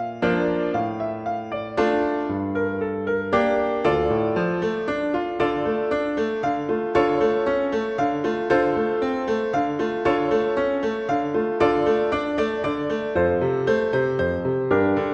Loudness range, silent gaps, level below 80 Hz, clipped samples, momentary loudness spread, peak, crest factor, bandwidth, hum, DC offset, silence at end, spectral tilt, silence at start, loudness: 1 LU; none; -48 dBFS; under 0.1%; 5 LU; -6 dBFS; 16 dB; 8 kHz; none; under 0.1%; 0 s; -7 dB/octave; 0 s; -23 LUFS